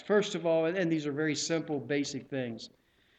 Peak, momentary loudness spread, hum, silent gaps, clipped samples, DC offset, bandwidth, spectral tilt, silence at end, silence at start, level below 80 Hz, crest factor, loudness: -14 dBFS; 10 LU; none; none; under 0.1%; under 0.1%; 9.2 kHz; -4.5 dB/octave; 0.5 s; 0 s; -74 dBFS; 18 dB; -31 LUFS